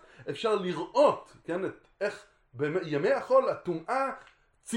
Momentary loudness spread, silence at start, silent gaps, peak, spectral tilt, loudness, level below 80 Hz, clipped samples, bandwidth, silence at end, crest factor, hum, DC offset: 13 LU; 0.2 s; none; -12 dBFS; -5.5 dB/octave; -29 LUFS; -70 dBFS; under 0.1%; 11.5 kHz; 0 s; 18 dB; none; under 0.1%